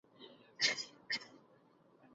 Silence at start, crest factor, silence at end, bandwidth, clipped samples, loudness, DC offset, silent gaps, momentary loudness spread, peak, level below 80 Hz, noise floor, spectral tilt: 0.2 s; 24 dB; 0.9 s; 8 kHz; under 0.1%; -37 LUFS; under 0.1%; none; 24 LU; -18 dBFS; -90 dBFS; -68 dBFS; 1.5 dB/octave